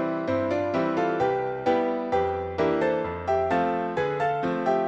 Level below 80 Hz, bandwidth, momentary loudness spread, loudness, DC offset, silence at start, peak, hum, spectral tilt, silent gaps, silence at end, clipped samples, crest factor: -54 dBFS; 8 kHz; 2 LU; -26 LUFS; under 0.1%; 0 s; -12 dBFS; none; -7 dB/octave; none; 0 s; under 0.1%; 14 dB